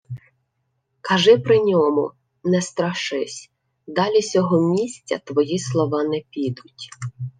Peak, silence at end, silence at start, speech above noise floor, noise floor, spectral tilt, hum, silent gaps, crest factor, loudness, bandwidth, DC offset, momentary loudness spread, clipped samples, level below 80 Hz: -2 dBFS; 0.1 s; 0.1 s; 53 dB; -72 dBFS; -5.5 dB/octave; none; none; 18 dB; -20 LUFS; 9.8 kHz; under 0.1%; 18 LU; under 0.1%; -64 dBFS